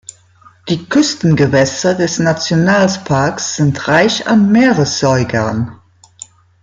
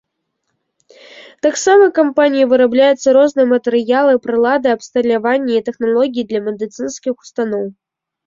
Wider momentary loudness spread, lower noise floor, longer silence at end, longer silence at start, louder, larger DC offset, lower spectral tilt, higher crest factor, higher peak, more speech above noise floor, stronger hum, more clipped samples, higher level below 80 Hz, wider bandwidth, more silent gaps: second, 7 LU vs 12 LU; second, -46 dBFS vs -72 dBFS; first, 0.9 s vs 0.55 s; second, 0.65 s vs 1.15 s; about the same, -13 LUFS vs -14 LUFS; neither; about the same, -5 dB/octave vs -4 dB/octave; about the same, 12 dB vs 14 dB; about the same, -2 dBFS vs -2 dBFS; second, 34 dB vs 58 dB; neither; neither; first, -48 dBFS vs -60 dBFS; first, 9.4 kHz vs 7.8 kHz; neither